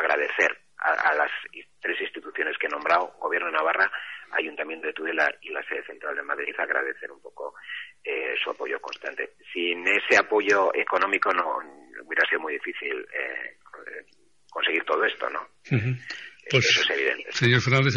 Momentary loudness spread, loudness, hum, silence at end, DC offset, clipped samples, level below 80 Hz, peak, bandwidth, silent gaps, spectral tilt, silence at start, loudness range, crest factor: 17 LU; -25 LUFS; none; 0 s; 0.1%; under 0.1%; -66 dBFS; -6 dBFS; 8.4 kHz; none; -4.5 dB/octave; 0 s; 7 LU; 20 dB